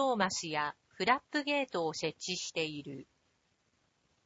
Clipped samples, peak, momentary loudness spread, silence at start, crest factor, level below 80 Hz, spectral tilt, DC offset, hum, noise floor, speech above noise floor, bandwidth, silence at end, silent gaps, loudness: under 0.1%; -14 dBFS; 9 LU; 0 s; 22 dB; -74 dBFS; -3 dB/octave; under 0.1%; none; -76 dBFS; 41 dB; 8 kHz; 1.2 s; none; -34 LUFS